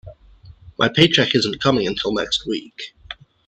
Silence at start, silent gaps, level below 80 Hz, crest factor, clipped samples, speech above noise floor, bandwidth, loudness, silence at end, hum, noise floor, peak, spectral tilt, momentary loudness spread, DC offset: 0.05 s; none; -48 dBFS; 20 dB; under 0.1%; 27 dB; 10 kHz; -18 LUFS; 0.35 s; none; -46 dBFS; 0 dBFS; -4.5 dB/octave; 22 LU; under 0.1%